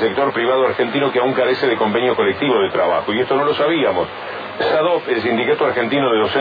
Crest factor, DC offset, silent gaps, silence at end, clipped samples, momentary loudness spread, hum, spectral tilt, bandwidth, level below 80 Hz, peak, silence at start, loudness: 12 dB; under 0.1%; none; 0 s; under 0.1%; 3 LU; none; -7.5 dB/octave; 5 kHz; -58 dBFS; -4 dBFS; 0 s; -17 LUFS